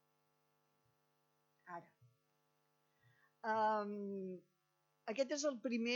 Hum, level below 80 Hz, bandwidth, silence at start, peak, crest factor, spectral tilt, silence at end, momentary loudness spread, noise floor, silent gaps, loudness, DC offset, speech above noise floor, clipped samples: none; under -90 dBFS; 19 kHz; 1.65 s; -24 dBFS; 20 dB; -4 dB/octave; 0 s; 17 LU; -82 dBFS; none; -41 LUFS; under 0.1%; 43 dB; under 0.1%